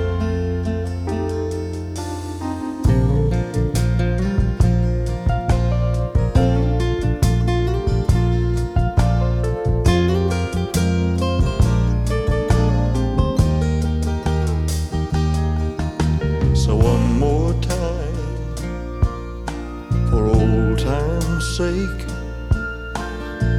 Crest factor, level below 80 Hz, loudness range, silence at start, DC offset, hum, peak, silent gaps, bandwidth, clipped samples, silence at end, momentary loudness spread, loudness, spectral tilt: 16 dB; -24 dBFS; 3 LU; 0 s; under 0.1%; none; -2 dBFS; none; 14 kHz; under 0.1%; 0 s; 10 LU; -20 LUFS; -7 dB/octave